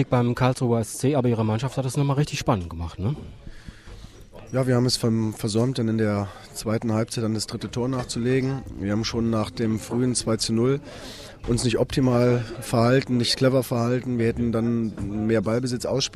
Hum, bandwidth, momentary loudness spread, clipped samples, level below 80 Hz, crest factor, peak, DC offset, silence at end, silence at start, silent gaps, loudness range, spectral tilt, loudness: none; 14.5 kHz; 9 LU; under 0.1%; -46 dBFS; 16 dB; -8 dBFS; under 0.1%; 0 s; 0 s; none; 4 LU; -5.5 dB/octave; -24 LUFS